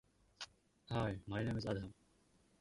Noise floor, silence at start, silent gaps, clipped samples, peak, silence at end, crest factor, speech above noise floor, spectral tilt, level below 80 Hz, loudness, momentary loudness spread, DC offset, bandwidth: -73 dBFS; 0.4 s; none; under 0.1%; -26 dBFS; 0.7 s; 20 dB; 32 dB; -6.5 dB/octave; -62 dBFS; -43 LUFS; 13 LU; under 0.1%; 11.5 kHz